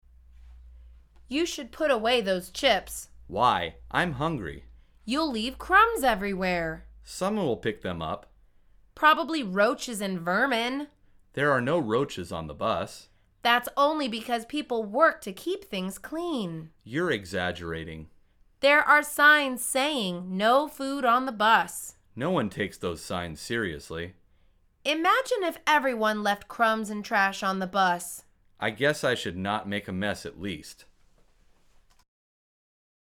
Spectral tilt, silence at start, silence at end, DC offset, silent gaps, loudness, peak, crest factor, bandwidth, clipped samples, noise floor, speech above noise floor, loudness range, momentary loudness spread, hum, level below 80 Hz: -4 dB/octave; 0.45 s; 2.3 s; under 0.1%; none; -26 LUFS; -6 dBFS; 22 dB; 19 kHz; under 0.1%; -62 dBFS; 36 dB; 7 LU; 15 LU; none; -54 dBFS